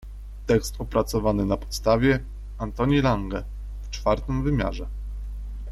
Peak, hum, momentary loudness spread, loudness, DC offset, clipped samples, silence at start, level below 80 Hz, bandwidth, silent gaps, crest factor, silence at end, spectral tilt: -8 dBFS; 50 Hz at -35 dBFS; 16 LU; -25 LUFS; under 0.1%; under 0.1%; 0 s; -34 dBFS; 13.5 kHz; none; 16 dB; 0 s; -6.5 dB/octave